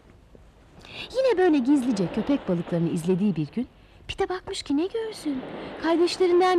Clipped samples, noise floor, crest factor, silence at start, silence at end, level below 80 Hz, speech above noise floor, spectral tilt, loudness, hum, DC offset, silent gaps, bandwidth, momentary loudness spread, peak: under 0.1%; -52 dBFS; 12 dB; 0.85 s; 0 s; -54 dBFS; 28 dB; -6 dB/octave; -25 LUFS; none; under 0.1%; none; 12.5 kHz; 13 LU; -12 dBFS